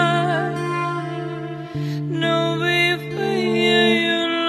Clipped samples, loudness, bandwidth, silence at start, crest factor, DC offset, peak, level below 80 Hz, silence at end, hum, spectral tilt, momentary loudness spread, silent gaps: under 0.1%; -20 LUFS; 13 kHz; 0 s; 16 dB; under 0.1%; -4 dBFS; -60 dBFS; 0 s; none; -5.5 dB/octave; 12 LU; none